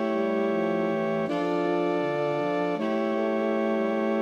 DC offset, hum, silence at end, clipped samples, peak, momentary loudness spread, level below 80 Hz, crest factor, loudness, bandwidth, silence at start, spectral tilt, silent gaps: under 0.1%; none; 0 s; under 0.1%; -14 dBFS; 1 LU; -70 dBFS; 12 dB; -26 LUFS; 9.4 kHz; 0 s; -7.5 dB/octave; none